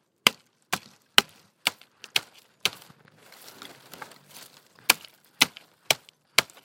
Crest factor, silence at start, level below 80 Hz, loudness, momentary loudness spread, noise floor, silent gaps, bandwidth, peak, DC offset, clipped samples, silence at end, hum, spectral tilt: 30 dB; 0.25 s; -70 dBFS; -26 LUFS; 23 LU; -54 dBFS; none; 16.5 kHz; 0 dBFS; under 0.1%; under 0.1%; 0.2 s; none; 0 dB/octave